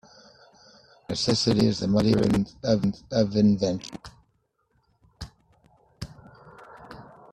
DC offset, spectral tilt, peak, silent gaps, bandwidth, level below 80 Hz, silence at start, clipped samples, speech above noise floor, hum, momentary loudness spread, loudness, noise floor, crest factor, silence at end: under 0.1%; -6 dB/octave; -8 dBFS; none; 11.5 kHz; -52 dBFS; 1.1 s; under 0.1%; 48 dB; none; 23 LU; -24 LUFS; -71 dBFS; 20 dB; 0.3 s